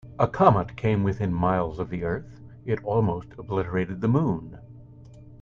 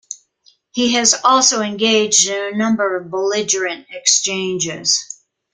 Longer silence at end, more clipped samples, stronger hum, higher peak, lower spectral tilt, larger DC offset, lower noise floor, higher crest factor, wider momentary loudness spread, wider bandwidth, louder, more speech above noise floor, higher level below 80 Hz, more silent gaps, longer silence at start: second, 0.05 s vs 0.4 s; neither; neither; second, -4 dBFS vs 0 dBFS; first, -9.5 dB/octave vs -1.5 dB/octave; neither; second, -47 dBFS vs -56 dBFS; about the same, 22 dB vs 18 dB; about the same, 14 LU vs 12 LU; second, 7 kHz vs 10.5 kHz; second, -25 LUFS vs -15 LUFS; second, 22 dB vs 39 dB; first, -48 dBFS vs -62 dBFS; neither; about the same, 0.05 s vs 0.1 s